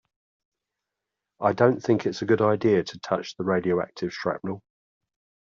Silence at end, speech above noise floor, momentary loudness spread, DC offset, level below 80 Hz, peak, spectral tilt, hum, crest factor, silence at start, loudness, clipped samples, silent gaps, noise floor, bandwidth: 0.95 s; 61 dB; 10 LU; under 0.1%; -66 dBFS; -6 dBFS; -5.5 dB/octave; 50 Hz at -55 dBFS; 20 dB; 1.4 s; -25 LUFS; under 0.1%; none; -85 dBFS; 7.4 kHz